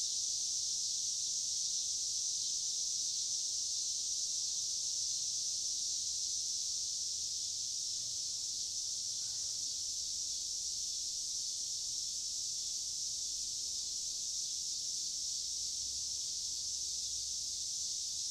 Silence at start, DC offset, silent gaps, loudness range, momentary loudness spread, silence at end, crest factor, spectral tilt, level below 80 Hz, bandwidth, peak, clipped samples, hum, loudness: 0 s; under 0.1%; none; 2 LU; 3 LU; 0 s; 16 dB; 2.5 dB/octave; -70 dBFS; 16 kHz; -22 dBFS; under 0.1%; none; -35 LUFS